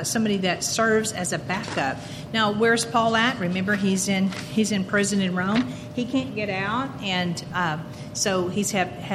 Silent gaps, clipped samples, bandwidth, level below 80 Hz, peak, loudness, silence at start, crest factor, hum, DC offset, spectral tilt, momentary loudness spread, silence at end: none; under 0.1%; 15 kHz; -54 dBFS; -6 dBFS; -24 LUFS; 0 s; 18 dB; none; under 0.1%; -4 dB/octave; 7 LU; 0 s